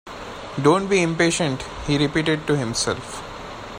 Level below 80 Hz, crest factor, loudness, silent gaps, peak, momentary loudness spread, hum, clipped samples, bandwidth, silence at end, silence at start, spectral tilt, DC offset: -44 dBFS; 18 dB; -21 LUFS; none; -4 dBFS; 16 LU; none; under 0.1%; 15.5 kHz; 0 s; 0.05 s; -4.5 dB/octave; under 0.1%